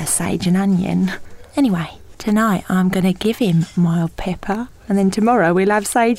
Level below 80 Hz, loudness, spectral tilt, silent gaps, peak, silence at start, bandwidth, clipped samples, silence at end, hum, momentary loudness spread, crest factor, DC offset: -42 dBFS; -18 LUFS; -5.5 dB/octave; none; -4 dBFS; 0 s; 16 kHz; under 0.1%; 0 s; none; 10 LU; 12 dB; under 0.1%